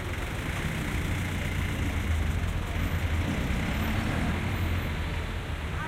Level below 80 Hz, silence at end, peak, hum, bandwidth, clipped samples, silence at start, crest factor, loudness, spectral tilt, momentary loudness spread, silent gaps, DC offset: -34 dBFS; 0 s; -16 dBFS; none; 16 kHz; under 0.1%; 0 s; 12 dB; -30 LUFS; -5.5 dB/octave; 4 LU; none; under 0.1%